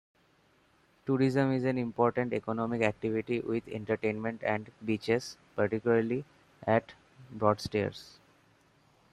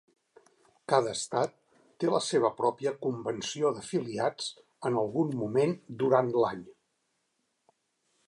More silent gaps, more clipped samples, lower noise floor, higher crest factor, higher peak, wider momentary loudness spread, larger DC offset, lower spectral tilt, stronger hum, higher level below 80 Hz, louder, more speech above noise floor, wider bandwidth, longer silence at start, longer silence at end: neither; neither; second, -67 dBFS vs -78 dBFS; about the same, 22 dB vs 22 dB; about the same, -10 dBFS vs -10 dBFS; about the same, 7 LU vs 8 LU; neither; first, -7 dB/octave vs -5 dB/octave; neither; first, -66 dBFS vs -74 dBFS; about the same, -31 LUFS vs -30 LUFS; second, 36 dB vs 49 dB; first, 13 kHz vs 11.5 kHz; first, 1.05 s vs 0.9 s; second, 1.05 s vs 1.55 s